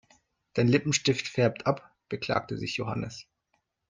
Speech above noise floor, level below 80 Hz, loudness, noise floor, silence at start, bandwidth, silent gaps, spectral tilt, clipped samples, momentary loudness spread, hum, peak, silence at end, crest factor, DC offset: 49 dB; -62 dBFS; -28 LUFS; -76 dBFS; 0.55 s; 9.6 kHz; none; -5 dB/octave; under 0.1%; 12 LU; none; -10 dBFS; 0.7 s; 20 dB; under 0.1%